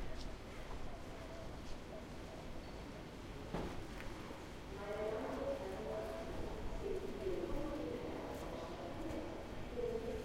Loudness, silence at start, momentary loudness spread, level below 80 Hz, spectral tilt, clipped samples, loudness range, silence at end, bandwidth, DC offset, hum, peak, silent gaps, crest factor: -46 LUFS; 0 s; 8 LU; -52 dBFS; -6 dB/octave; under 0.1%; 6 LU; 0 s; 16 kHz; under 0.1%; none; -28 dBFS; none; 16 dB